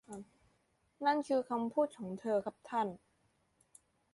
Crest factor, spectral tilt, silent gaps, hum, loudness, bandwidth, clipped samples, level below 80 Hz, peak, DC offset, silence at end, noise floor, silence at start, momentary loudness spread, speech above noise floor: 20 dB; -6 dB/octave; none; none; -36 LUFS; 11.5 kHz; under 0.1%; -78 dBFS; -18 dBFS; under 0.1%; 1.2 s; -76 dBFS; 0.1 s; 14 LU; 41 dB